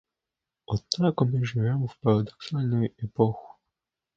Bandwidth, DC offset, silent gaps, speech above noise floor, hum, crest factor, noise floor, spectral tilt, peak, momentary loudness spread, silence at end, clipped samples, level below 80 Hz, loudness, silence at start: 7.8 kHz; under 0.1%; none; 62 dB; none; 22 dB; -88 dBFS; -7 dB/octave; -4 dBFS; 8 LU; 0.7 s; under 0.1%; -56 dBFS; -27 LUFS; 0.7 s